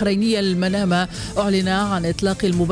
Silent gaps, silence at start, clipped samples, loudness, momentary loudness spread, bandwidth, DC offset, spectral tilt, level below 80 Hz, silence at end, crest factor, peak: none; 0 s; under 0.1%; -20 LUFS; 3 LU; 10.5 kHz; under 0.1%; -5.5 dB/octave; -40 dBFS; 0 s; 12 dB; -6 dBFS